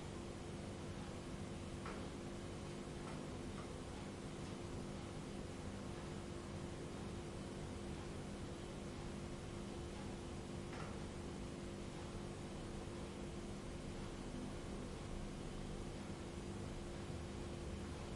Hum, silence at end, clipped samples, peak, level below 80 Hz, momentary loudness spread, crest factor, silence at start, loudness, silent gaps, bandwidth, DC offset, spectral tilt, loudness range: 50 Hz at -65 dBFS; 0 s; under 0.1%; -36 dBFS; -56 dBFS; 1 LU; 12 dB; 0 s; -49 LUFS; none; 11.5 kHz; under 0.1%; -5.5 dB/octave; 0 LU